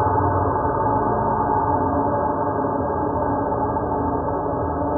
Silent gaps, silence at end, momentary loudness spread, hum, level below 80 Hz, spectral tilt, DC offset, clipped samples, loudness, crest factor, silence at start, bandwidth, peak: none; 0 s; 3 LU; none; -38 dBFS; -4.5 dB/octave; under 0.1%; under 0.1%; -21 LUFS; 12 dB; 0 s; 1.8 kHz; -8 dBFS